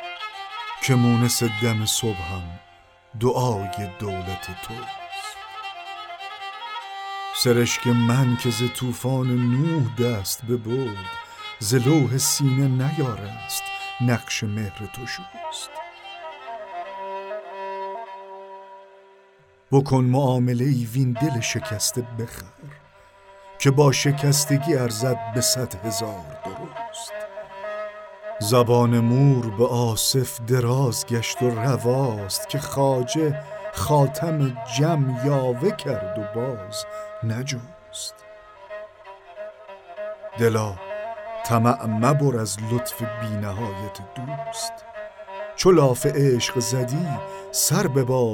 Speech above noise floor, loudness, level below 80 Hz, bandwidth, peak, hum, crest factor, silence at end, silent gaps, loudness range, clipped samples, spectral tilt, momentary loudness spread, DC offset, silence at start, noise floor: 33 dB; -23 LUFS; -54 dBFS; 18 kHz; -4 dBFS; none; 20 dB; 0 s; none; 10 LU; under 0.1%; -5 dB/octave; 16 LU; under 0.1%; 0 s; -55 dBFS